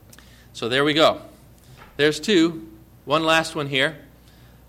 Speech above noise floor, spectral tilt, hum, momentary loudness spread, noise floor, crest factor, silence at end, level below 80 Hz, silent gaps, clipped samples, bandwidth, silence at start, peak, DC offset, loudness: 29 dB; -4 dB/octave; 60 Hz at -50 dBFS; 20 LU; -49 dBFS; 18 dB; 0.65 s; -54 dBFS; none; under 0.1%; 16 kHz; 0.55 s; -6 dBFS; under 0.1%; -20 LUFS